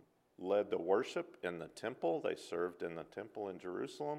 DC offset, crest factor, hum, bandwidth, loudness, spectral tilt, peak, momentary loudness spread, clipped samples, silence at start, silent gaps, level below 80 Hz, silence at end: under 0.1%; 20 dB; none; 12.5 kHz; -40 LUFS; -5.5 dB/octave; -20 dBFS; 10 LU; under 0.1%; 0.4 s; none; -82 dBFS; 0 s